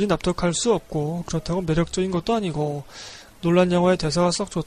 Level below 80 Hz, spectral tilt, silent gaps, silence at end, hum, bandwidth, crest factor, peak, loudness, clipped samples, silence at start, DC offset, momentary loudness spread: -44 dBFS; -5.5 dB/octave; none; 0 s; none; 12 kHz; 16 dB; -6 dBFS; -22 LUFS; under 0.1%; 0 s; under 0.1%; 9 LU